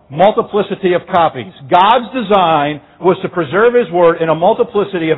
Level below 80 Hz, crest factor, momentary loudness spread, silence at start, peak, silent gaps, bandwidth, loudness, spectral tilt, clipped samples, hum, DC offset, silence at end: -52 dBFS; 12 dB; 6 LU; 0.1 s; 0 dBFS; none; 4.1 kHz; -13 LUFS; -8.5 dB/octave; under 0.1%; none; under 0.1%; 0 s